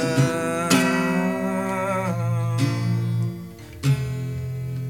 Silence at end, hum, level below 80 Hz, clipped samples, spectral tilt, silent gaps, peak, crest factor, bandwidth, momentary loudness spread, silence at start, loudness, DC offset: 0 s; none; -50 dBFS; under 0.1%; -6 dB/octave; none; -4 dBFS; 18 dB; 17.5 kHz; 10 LU; 0 s; -23 LUFS; 0.2%